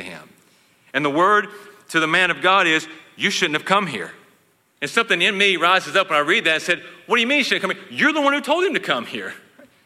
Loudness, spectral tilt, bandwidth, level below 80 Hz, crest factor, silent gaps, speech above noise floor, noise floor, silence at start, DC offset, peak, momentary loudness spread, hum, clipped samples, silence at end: -18 LUFS; -3 dB/octave; 15.5 kHz; -74 dBFS; 18 dB; none; 40 dB; -60 dBFS; 0 s; under 0.1%; -2 dBFS; 13 LU; none; under 0.1%; 0.5 s